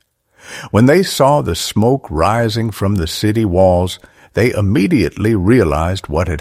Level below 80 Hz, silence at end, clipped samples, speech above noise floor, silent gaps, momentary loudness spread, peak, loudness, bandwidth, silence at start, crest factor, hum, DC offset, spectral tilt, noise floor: -32 dBFS; 0 s; under 0.1%; 30 dB; none; 7 LU; 0 dBFS; -14 LUFS; 16 kHz; 0.45 s; 14 dB; none; under 0.1%; -6 dB/octave; -44 dBFS